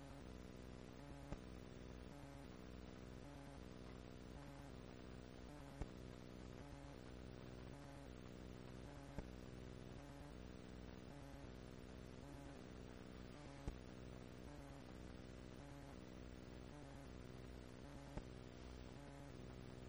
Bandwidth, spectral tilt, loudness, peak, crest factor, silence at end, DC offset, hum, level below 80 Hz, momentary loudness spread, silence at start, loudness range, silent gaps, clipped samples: over 20 kHz; -6 dB/octave; -58 LUFS; -34 dBFS; 22 dB; 0 s; under 0.1%; none; -62 dBFS; 2 LU; 0 s; 1 LU; none; under 0.1%